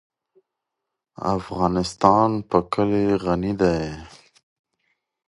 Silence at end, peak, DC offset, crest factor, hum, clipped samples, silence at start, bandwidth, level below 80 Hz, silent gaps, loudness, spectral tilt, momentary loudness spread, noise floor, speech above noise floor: 1.2 s; 0 dBFS; under 0.1%; 24 dB; none; under 0.1%; 1.2 s; 11.5 kHz; -46 dBFS; none; -21 LUFS; -7 dB/octave; 10 LU; -83 dBFS; 62 dB